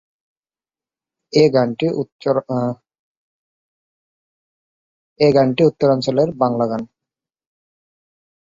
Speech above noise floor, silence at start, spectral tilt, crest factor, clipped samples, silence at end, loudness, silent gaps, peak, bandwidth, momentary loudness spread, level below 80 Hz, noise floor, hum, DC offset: over 74 dB; 1.35 s; -7 dB/octave; 20 dB; under 0.1%; 1.7 s; -17 LUFS; 2.12-2.19 s, 2.99-5.16 s; -2 dBFS; 7.6 kHz; 10 LU; -60 dBFS; under -90 dBFS; none; under 0.1%